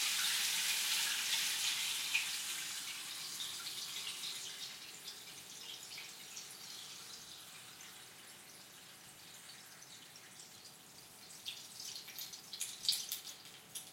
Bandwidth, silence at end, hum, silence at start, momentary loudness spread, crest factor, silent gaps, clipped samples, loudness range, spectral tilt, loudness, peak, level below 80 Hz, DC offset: 16.5 kHz; 0 s; none; 0 s; 20 LU; 26 dB; none; under 0.1%; 17 LU; 2 dB/octave; -39 LUFS; -18 dBFS; -88 dBFS; under 0.1%